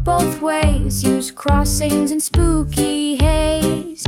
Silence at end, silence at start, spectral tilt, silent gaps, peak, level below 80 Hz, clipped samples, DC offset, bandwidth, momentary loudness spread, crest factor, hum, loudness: 0 s; 0 s; -5 dB/octave; none; -2 dBFS; -24 dBFS; under 0.1%; under 0.1%; 17.5 kHz; 3 LU; 14 dB; none; -17 LUFS